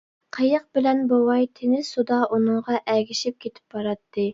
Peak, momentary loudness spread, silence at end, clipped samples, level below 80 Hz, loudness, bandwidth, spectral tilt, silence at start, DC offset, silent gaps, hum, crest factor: -6 dBFS; 10 LU; 0 s; under 0.1%; -68 dBFS; -23 LUFS; 7.8 kHz; -5 dB/octave; 0.35 s; under 0.1%; none; none; 16 dB